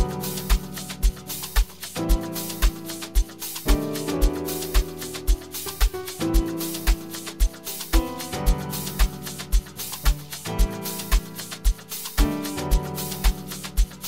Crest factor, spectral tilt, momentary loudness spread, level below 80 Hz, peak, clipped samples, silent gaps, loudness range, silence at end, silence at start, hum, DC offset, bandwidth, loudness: 18 dB; -4 dB/octave; 6 LU; -26 dBFS; -6 dBFS; under 0.1%; none; 1 LU; 0 s; 0 s; none; 0.3%; 16.5 kHz; -27 LUFS